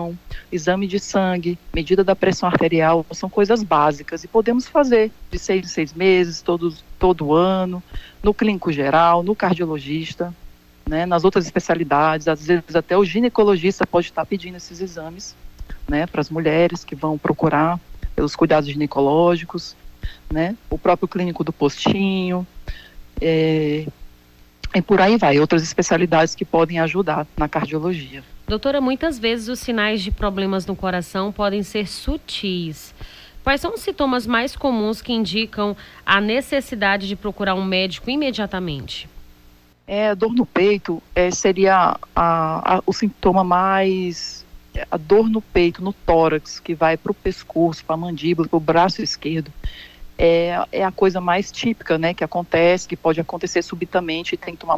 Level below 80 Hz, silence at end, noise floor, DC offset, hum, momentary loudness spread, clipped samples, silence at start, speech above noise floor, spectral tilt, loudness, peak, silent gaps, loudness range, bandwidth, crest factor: -38 dBFS; 0 s; -50 dBFS; under 0.1%; none; 12 LU; under 0.1%; 0 s; 31 dB; -5.5 dB/octave; -19 LUFS; -2 dBFS; none; 5 LU; 16 kHz; 16 dB